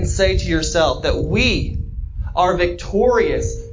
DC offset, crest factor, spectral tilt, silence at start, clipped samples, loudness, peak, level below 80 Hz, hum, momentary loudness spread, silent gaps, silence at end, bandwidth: under 0.1%; 16 dB; -5 dB/octave; 0 s; under 0.1%; -18 LUFS; -2 dBFS; -26 dBFS; none; 10 LU; none; 0 s; 7.6 kHz